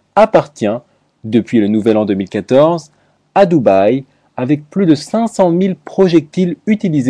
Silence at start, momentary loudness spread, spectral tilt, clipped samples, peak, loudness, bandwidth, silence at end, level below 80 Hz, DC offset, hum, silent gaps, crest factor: 0.15 s; 8 LU; -7.5 dB/octave; under 0.1%; 0 dBFS; -13 LUFS; 11 kHz; 0 s; -54 dBFS; under 0.1%; none; none; 12 dB